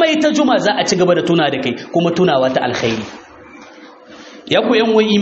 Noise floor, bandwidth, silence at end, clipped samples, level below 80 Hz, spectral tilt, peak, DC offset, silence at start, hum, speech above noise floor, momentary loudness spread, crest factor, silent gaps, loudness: -39 dBFS; 8 kHz; 0 s; under 0.1%; -54 dBFS; -3.5 dB/octave; 0 dBFS; under 0.1%; 0 s; none; 25 dB; 7 LU; 14 dB; none; -15 LUFS